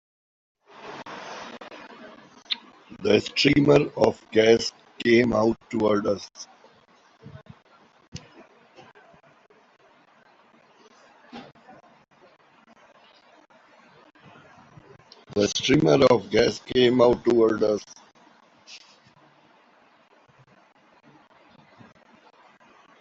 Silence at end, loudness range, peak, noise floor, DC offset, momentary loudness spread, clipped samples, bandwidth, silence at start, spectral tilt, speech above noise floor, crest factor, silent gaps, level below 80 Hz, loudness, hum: 4.25 s; 11 LU; -4 dBFS; -58 dBFS; under 0.1%; 26 LU; under 0.1%; 8 kHz; 0.85 s; -5 dB/octave; 38 dB; 22 dB; 8.08-8.12 s; -58 dBFS; -22 LUFS; none